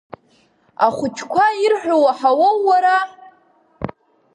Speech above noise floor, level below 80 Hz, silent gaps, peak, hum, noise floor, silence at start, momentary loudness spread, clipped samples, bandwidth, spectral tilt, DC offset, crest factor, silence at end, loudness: 42 dB; -56 dBFS; none; -2 dBFS; none; -57 dBFS; 0.8 s; 17 LU; under 0.1%; 10.5 kHz; -4.5 dB/octave; under 0.1%; 16 dB; 0.45 s; -16 LUFS